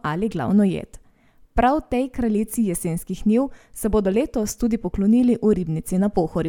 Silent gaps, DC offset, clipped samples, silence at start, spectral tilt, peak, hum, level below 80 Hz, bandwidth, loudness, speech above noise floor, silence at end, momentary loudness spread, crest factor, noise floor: none; under 0.1%; under 0.1%; 0.05 s; -6.5 dB/octave; -4 dBFS; none; -38 dBFS; 17.5 kHz; -22 LUFS; 33 dB; 0 s; 8 LU; 18 dB; -54 dBFS